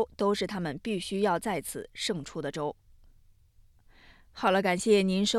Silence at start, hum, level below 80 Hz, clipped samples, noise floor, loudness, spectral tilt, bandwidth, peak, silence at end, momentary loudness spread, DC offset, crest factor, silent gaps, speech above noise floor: 0 s; none; -58 dBFS; under 0.1%; -60 dBFS; -29 LUFS; -4.5 dB/octave; 15 kHz; -12 dBFS; 0 s; 12 LU; under 0.1%; 18 dB; none; 31 dB